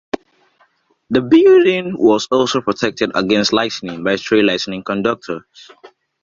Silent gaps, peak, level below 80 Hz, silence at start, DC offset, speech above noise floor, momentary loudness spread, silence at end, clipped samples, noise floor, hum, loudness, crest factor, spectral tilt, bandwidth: none; -2 dBFS; -54 dBFS; 0.15 s; under 0.1%; 43 dB; 12 LU; 0.35 s; under 0.1%; -58 dBFS; none; -15 LUFS; 14 dB; -5 dB/octave; 7.6 kHz